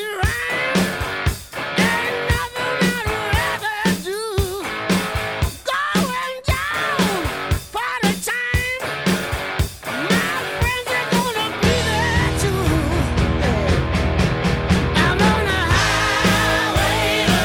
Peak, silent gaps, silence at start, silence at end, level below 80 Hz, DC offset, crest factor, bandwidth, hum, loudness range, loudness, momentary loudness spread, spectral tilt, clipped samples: -4 dBFS; none; 0 s; 0 s; -30 dBFS; under 0.1%; 16 dB; 19 kHz; none; 4 LU; -19 LUFS; 7 LU; -4.5 dB/octave; under 0.1%